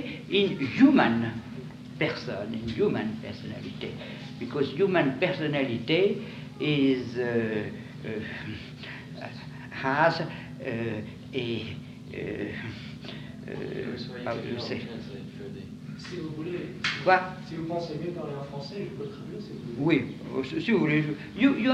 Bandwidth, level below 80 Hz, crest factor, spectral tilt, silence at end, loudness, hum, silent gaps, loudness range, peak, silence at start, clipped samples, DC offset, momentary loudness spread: 9 kHz; -60 dBFS; 22 dB; -7 dB/octave; 0 s; -29 LUFS; none; none; 9 LU; -6 dBFS; 0 s; under 0.1%; under 0.1%; 16 LU